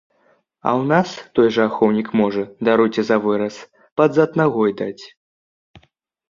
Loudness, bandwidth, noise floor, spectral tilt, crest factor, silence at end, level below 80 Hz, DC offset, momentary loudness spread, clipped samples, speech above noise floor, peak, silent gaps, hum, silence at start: -18 LUFS; 7.4 kHz; -61 dBFS; -7 dB/octave; 18 dB; 1.25 s; -60 dBFS; under 0.1%; 11 LU; under 0.1%; 43 dB; -2 dBFS; 3.92-3.96 s; none; 0.65 s